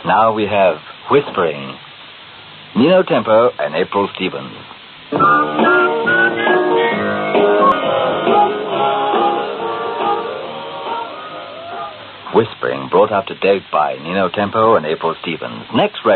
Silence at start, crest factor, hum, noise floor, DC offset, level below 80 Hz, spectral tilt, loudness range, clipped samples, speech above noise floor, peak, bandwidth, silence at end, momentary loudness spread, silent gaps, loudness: 0 s; 14 dB; none; -37 dBFS; under 0.1%; -58 dBFS; -3 dB/octave; 6 LU; under 0.1%; 22 dB; 0 dBFS; 4.6 kHz; 0 s; 16 LU; none; -15 LUFS